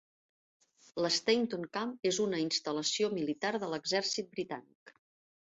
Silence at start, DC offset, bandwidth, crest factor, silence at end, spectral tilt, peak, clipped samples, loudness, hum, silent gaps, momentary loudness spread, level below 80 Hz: 0.95 s; under 0.1%; 8.2 kHz; 22 dB; 0.5 s; -3 dB/octave; -14 dBFS; under 0.1%; -33 LUFS; none; 4.75-4.86 s; 9 LU; -78 dBFS